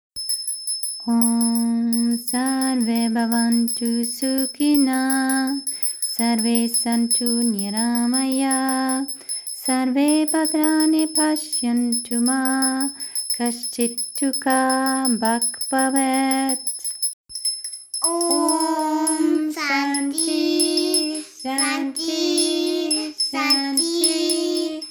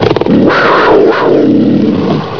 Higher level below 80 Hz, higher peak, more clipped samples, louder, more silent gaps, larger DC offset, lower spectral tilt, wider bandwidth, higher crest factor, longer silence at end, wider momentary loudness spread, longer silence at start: second, -72 dBFS vs -40 dBFS; second, -4 dBFS vs 0 dBFS; second, under 0.1% vs 2%; second, -20 LUFS vs -7 LUFS; first, 17.13-17.25 s vs none; second, under 0.1% vs 2%; second, -2 dB/octave vs -7.5 dB/octave; first, over 20 kHz vs 5.4 kHz; first, 16 dB vs 8 dB; about the same, 0 s vs 0 s; about the same, 6 LU vs 4 LU; first, 0.15 s vs 0 s